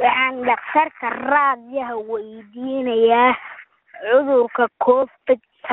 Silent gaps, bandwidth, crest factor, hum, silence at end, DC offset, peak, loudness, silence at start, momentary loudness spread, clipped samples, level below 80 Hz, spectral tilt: none; 4 kHz; 16 dB; none; 0 s; under 0.1%; -2 dBFS; -19 LUFS; 0 s; 13 LU; under 0.1%; -64 dBFS; -1 dB/octave